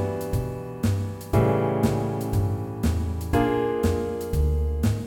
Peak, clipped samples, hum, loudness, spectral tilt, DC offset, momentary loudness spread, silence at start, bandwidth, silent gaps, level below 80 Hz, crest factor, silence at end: -8 dBFS; under 0.1%; none; -25 LUFS; -7.5 dB/octave; under 0.1%; 6 LU; 0 s; 17.5 kHz; none; -32 dBFS; 16 dB; 0 s